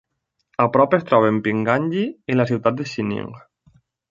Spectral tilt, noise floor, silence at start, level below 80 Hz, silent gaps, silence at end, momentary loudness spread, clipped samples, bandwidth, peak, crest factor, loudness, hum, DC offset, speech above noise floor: -7.5 dB/octave; -74 dBFS; 0.6 s; -58 dBFS; none; 0.7 s; 10 LU; under 0.1%; 7.6 kHz; -2 dBFS; 20 dB; -20 LUFS; none; under 0.1%; 55 dB